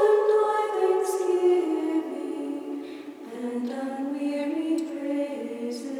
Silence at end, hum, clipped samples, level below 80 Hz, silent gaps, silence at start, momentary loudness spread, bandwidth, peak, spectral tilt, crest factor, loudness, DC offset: 0 s; none; under 0.1%; under -90 dBFS; none; 0 s; 12 LU; 15 kHz; -10 dBFS; -4 dB/octave; 16 dB; -27 LUFS; under 0.1%